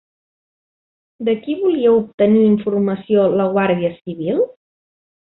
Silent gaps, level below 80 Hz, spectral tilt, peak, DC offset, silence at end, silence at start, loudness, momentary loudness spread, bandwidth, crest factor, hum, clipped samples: 2.14-2.18 s; -58 dBFS; -12 dB/octave; -4 dBFS; under 0.1%; 0.9 s; 1.2 s; -17 LUFS; 9 LU; 4.1 kHz; 14 dB; none; under 0.1%